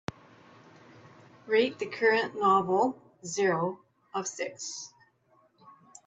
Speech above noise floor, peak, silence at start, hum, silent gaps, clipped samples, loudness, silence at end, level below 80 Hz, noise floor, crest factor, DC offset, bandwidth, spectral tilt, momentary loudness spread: 38 dB; -12 dBFS; 1.45 s; none; none; under 0.1%; -28 LUFS; 0.35 s; -74 dBFS; -66 dBFS; 20 dB; under 0.1%; 8.6 kHz; -4 dB/octave; 17 LU